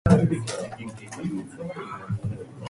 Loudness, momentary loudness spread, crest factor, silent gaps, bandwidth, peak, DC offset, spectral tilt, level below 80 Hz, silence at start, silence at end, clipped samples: -29 LUFS; 15 LU; 20 dB; none; 11.5 kHz; -6 dBFS; under 0.1%; -7 dB/octave; -44 dBFS; 0.05 s; 0 s; under 0.1%